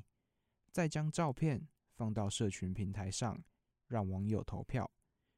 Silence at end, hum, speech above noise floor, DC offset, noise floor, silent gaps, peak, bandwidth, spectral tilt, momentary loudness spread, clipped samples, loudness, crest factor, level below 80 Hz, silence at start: 0.5 s; none; 46 dB; under 0.1%; -84 dBFS; none; -20 dBFS; 13.5 kHz; -6 dB/octave; 8 LU; under 0.1%; -39 LUFS; 18 dB; -60 dBFS; 0.75 s